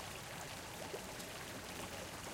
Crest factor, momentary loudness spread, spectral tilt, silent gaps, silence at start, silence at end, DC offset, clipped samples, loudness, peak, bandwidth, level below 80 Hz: 16 dB; 1 LU; -3 dB/octave; none; 0 s; 0 s; under 0.1%; under 0.1%; -46 LUFS; -32 dBFS; 17 kHz; -64 dBFS